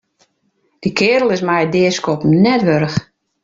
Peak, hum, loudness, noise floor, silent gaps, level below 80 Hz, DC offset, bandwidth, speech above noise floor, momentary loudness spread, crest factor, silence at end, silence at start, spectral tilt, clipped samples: -2 dBFS; none; -15 LUFS; -63 dBFS; none; -52 dBFS; under 0.1%; 7.6 kHz; 50 dB; 8 LU; 14 dB; 0.4 s; 0.8 s; -6 dB/octave; under 0.1%